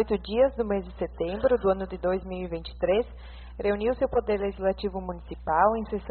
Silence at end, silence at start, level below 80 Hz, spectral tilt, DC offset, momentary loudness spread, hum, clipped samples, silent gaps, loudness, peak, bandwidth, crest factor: 0 s; 0 s; -42 dBFS; -5 dB/octave; under 0.1%; 12 LU; none; under 0.1%; none; -27 LUFS; -8 dBFS; 4.5 kHz; 18 dB